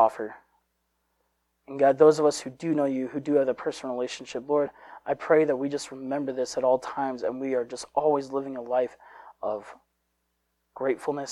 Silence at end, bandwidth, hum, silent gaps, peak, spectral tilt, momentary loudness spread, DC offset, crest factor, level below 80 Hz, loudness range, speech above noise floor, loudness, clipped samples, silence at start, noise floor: 0 s; 12 kHz; none; none; -6 dBFS; -5 dB/octave; 11 LU; under 0.1%; 22 dB; -70 dBFS; 5 LU; 50 dB; -27 LUFS; under 0.1%; 0 s; -76 dBFS